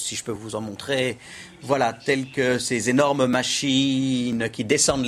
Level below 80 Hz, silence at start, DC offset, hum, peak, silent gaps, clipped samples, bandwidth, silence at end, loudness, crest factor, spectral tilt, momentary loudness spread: -54 dBFS; 0 s; under 0.1%; none; -6 dBFS; none; under 0.1%; 14.5 kHz; 0 s; -23 LUFS; 18 dB; -3.5 dB/octave; 11 LU